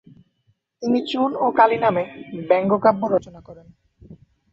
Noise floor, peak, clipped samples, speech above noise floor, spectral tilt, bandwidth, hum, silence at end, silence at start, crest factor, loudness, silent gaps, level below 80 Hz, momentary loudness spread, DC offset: -66 dBFS; -2 dBFS; under 0.1%; 47 dB; -7 dB/octave; 7.8 kHz; none; 0.35 s; 0.8 s; 20 dB; -20 LUFS; none; -60 dBFS; 11 LU; under 0.1%